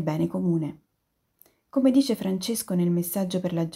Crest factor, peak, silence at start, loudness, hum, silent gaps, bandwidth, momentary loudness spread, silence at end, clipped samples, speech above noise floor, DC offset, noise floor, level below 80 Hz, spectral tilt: 16 dB; -10 dBFS; 0 s; -25 LUFS; none; none; 16 kHz; 7 LU; 0 s; under 0.1%; 50 dB; under 0.1%; -75 dBFS; -66 dBFS; -6.5 dB/octave